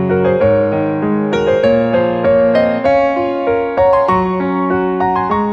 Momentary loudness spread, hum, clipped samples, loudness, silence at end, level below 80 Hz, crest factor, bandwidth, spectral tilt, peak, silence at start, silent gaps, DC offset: 4 LU; none; under 0.1%; -13 LUFS; 0 s; -40 dBFS; 12 dB; 7 kHz; -8 dB/octave; -2 dBFS; 0 s; none; under 0.1%